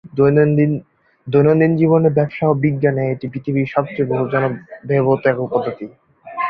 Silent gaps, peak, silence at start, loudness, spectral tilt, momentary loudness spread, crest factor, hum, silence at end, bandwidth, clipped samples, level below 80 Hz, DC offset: none; -2 dBFS; 0.05 s; -17 LUFS; -11.5 dB/octave; 11 LU; 14 dB; none; 0 s; 5 kHz; under 0.1%; -54 dBFS; under 0.1%